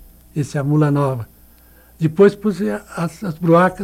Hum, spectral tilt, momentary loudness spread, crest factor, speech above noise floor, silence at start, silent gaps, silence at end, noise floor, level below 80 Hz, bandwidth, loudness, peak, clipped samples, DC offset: none; -8 dB/octave; 12 LU; 16 dB; 31 dB; 0.35 s; none; 0 s; -48 dBFS; -50 dBFS; 15.5 kHz; -18 LUFS; -2 dBFS; under 0.1%; under 0.1%